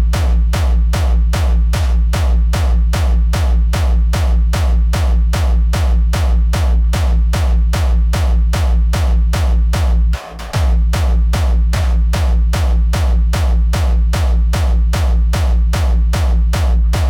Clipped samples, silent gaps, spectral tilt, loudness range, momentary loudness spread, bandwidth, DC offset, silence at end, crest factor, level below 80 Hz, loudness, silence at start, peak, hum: under 0.1%; none; -6 dB/octave; 1 LU; 0 LU; 13.5 kHz; under 0.1%; 0 s; 8 dB; -12 dBFS; -15 LUFS; 0 s; -4 dBFS; none